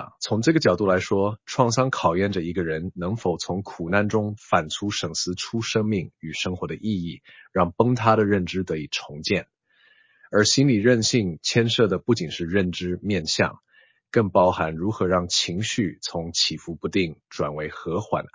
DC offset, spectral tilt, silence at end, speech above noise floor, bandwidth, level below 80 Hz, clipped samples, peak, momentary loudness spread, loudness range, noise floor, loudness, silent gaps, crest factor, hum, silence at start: under 0.1%; -4.5 dB/octave; 0.1 s; 37 dB; 7.8 kHz; -48 dBFS; under 0.1%; -2 dBFS; 10 LU; 4 LU; -60 dBFS; -23 LUFS; none; 22 dB; none; 0 s